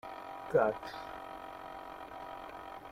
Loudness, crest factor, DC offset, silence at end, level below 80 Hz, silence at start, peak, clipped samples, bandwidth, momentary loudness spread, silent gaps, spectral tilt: -38 LUFS; 22 dB; under 0.1%; 0 s; -66 dBFS; 0.05 s; -16 dBFS; under 0.1%; 15.5 kHz; 16 LU; none; -6 dB/octave